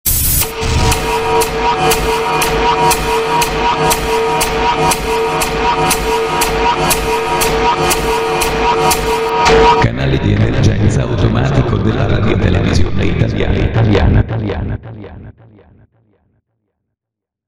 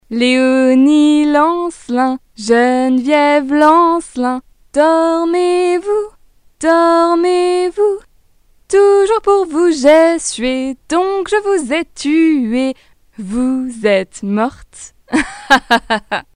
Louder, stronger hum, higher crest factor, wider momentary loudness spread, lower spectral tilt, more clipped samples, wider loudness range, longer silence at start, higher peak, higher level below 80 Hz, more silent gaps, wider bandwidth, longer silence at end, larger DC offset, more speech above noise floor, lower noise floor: about the same, -13 LUFS vs -13 LUFS; neither; about the same, 14 dB vs 14 dB; second, 4 LU vs 9 LU; about the same, -4.5 dB/octave vs -4 dB/octave; second, under 0.1% vs 0.2%; about the same, 4 LU vs 4 LU; about the same, 0.05 s vs 0.1 s; about the same, 0 dBFS vs 0 dBFS; first, -24 dBFS vs -46 dBFS; neither; first, 16.5 kHz vs 11.5 kHz; first, 2.15 s vs 0.15 s; neither; first, 70 dB vs 38 dB; first, -82 dBFS vs -51 dBFS